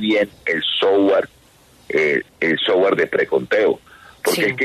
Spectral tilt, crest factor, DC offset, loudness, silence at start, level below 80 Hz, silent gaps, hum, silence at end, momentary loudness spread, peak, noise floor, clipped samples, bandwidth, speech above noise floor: -4 dB/octave; 14 dB; under 0.1%; -18 LUFS; 0 s; -58 dBFS; none; none; 0 s; 6 LU; -4 dBFS; -51 dBFS; under 0.1%; 13.5 kHz; 33 dB